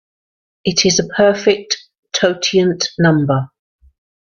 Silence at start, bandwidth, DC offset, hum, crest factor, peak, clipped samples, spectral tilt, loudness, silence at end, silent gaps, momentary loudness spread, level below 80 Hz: 0.65 s; 7.4 kHz; under 0.1%; none; 16 dB; 0 dBFS; under 0.1%; -4 dB/octave; -15 LUFS; 0.95 s; 1.98-2.03 s; 10 LU; -52 dBFS